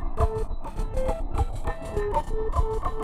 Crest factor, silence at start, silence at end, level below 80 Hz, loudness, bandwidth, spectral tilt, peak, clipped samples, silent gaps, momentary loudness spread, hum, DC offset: 14 dB; 0 s; 0 s; -28 dBFS; -30 LUFS; 11.5 kHz; -7 dB/octave; -12 dBFS; under 0.1%; none; 6 LU; none; under 0.1%